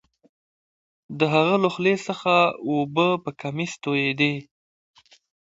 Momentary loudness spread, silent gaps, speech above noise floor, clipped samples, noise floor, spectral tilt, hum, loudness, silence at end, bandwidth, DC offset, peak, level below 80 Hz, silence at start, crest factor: 10 LU; none; over 68 dB; under 0.1%; under -90 dBFS; -5.5 dB/octave; none; -22 LUFS; 1 s; 8 kHz; under 0.1%; -6 dBFS; -68 dBFS; 1.1 s; 20 dB